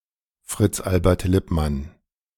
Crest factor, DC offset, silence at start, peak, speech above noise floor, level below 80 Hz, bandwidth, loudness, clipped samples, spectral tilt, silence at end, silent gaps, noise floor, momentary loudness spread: 20 dB; under 0.1%; 0.5 s; -4 dBFS; 29 dB; -34 dBFS; 18 kHz; -22 LUFS; under 0.1%; -6.5 dB/octave; 0.5 s; none; -50 dBFS; 12 LU